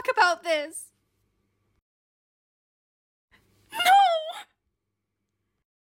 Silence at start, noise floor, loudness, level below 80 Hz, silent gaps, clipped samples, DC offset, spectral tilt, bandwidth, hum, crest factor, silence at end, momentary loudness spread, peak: 0.05 s; -82 dBFS; -22 LUFS; -76 dBFS; 1.82-3.28 s; under 0.1%; under 0.1%; 0 dB/octave; 17 kHz; none; 20 dB; 1.5 s; 20 LU; -8 dBFS